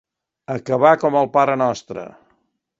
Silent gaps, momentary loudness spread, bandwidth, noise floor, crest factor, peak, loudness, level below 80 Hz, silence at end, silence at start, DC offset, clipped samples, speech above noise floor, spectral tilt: none; 19 LU; 7.8 kHz; -66 dBFS; 20 dB; 0 dBFS; -18 LUFS; -62 dBFS; 0.7 s; 0.5 s; under 0.1%; under 0.1%; 48 dB; -6.5 dB/octave